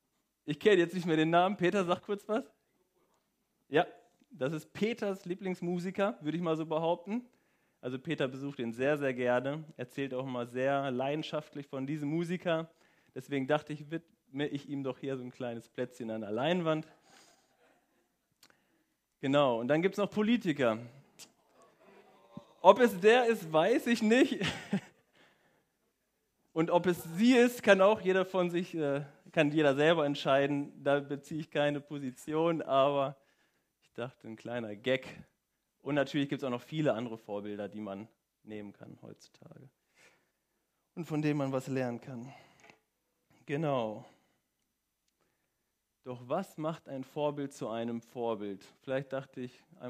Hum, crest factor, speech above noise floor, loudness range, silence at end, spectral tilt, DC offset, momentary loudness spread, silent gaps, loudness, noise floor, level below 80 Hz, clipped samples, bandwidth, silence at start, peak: none; 28 dB; 51 dB; 11 LU; 0 s; -6 dB/octave; under 0.1%; 17 LU; none; -32 LUFS; -83 dBFS; -78 dBFS; under 0.1%; 15.5 kHz; 0.45 s; -6 dBFS